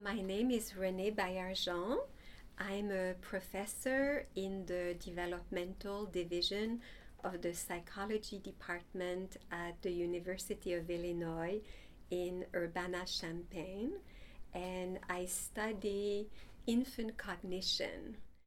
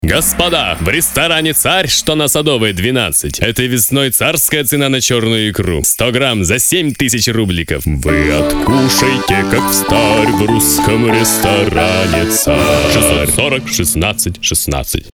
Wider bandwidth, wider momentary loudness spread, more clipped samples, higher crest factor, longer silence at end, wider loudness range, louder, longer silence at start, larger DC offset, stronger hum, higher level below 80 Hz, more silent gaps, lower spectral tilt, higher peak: second, 17 kHz vs over 20 kHz; first, 10 LU vs 4 LU; neither; first, 18 dB vs 12 dB; about the same, 0.05 s vs 0.05 s; about the same, 3 LU vs 2 LU; second, -41 LUFS vs -11 LUFS; about the same, 0 s vs 0 s; neither; neither; second, -58 dBFS vs -28 dBFS; neither; about the same, -4 dB/octave vs -3.5 dB/octave; second, -22 dBFS vs 0 dBFS